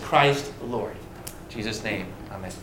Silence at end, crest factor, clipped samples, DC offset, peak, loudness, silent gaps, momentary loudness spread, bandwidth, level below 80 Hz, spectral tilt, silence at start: 0 s; 24 dB; under 0.1%; under 0.1%; -4 dBFS; -27 LUFS; none; 18 LU; 17 kHz; -48 dBFS; -4.5 dB/octave; 0 s